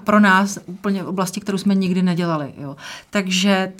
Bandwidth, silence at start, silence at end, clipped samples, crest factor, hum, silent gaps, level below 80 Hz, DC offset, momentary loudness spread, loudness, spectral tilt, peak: 15.5 kHz; 0 s; 0.05 s; under 0.1%; 16 dB; none; none; -62 dBFS; under 0.1%; 15 LU; -19 LUFS; -5 dB/octave; -2 dBFS